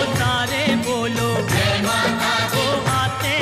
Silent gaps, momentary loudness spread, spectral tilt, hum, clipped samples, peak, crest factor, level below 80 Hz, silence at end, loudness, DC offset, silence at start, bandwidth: none; 2 LU; -4 dB/octave; none; under 0.1%; -6 dBFS; 14 dB; -42 dBFS; 0 s; -19 LUFS; under 0.1%; 0 s; 16 kHz